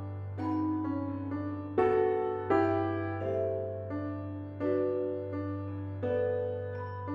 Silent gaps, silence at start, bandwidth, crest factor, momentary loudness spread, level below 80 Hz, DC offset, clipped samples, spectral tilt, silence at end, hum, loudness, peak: none; 0 s; 5.8 kHz; 18 dB; 10 LU; -66 dBFS; under 0.1%; under 0.1%; -10 dB/octave; 0 s; none; -33 LUFS; -14 dBFS